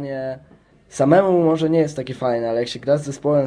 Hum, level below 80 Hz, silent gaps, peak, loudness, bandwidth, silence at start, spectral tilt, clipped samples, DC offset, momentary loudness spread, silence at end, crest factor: none; -56 dBFS; none; -2 dBFS; -19 LUFS; 10.5 kHz; 0 s; -7 dB/octave; under 0.1%; under 0.1%; 14 LU; 0 s; 16 dB